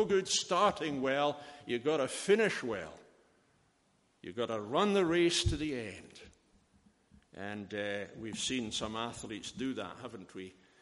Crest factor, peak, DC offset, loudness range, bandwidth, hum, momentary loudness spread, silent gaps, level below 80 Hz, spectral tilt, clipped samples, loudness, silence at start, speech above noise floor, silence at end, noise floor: 20 dB; -14 dBFS; under 0.1%; 7 LU; 11.5 kHz; none; 18 LU; none; -54 dBFS; -4 dB/octave; under 0.1%; -33 LUFS; 0 s; 38 dB; 0.3 s; -72 dBFS